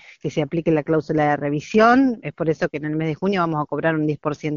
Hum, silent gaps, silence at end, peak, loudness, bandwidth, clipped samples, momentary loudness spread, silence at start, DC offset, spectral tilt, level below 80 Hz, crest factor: none; none; 0 s; -2 dBFS; -21 LUFS; 7.4 kHz; under 0.1%; 9 LU; 0.25 s; under 0.1%; -6 dB/octave; -54 dBFS; 18 dB